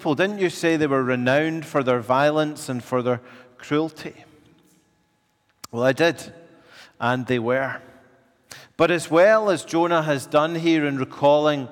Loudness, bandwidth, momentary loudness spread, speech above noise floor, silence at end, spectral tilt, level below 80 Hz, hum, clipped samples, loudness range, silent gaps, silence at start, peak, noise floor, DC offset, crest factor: -21 LUFS; 17 kHz; 12 LU; 46 dB; 0 s; -5.5 dB/octave; -68 dBFS; none; under 0.1%; 7 LU; none; 0 s; -6 dBFS; -67 dBFS; under 0.1%; 16 dB